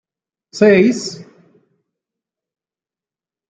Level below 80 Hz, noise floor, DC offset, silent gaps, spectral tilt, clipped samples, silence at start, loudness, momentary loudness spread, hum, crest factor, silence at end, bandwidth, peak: -64 dBFS; under -90 dBFS; under 0.1%; none; -5.5 dB/octave; under 0.1%; 0.55 s; -13 LUFS; 24 LU; none; 18 dB; 2.25 s; 9.2 kHz; -2 dBFS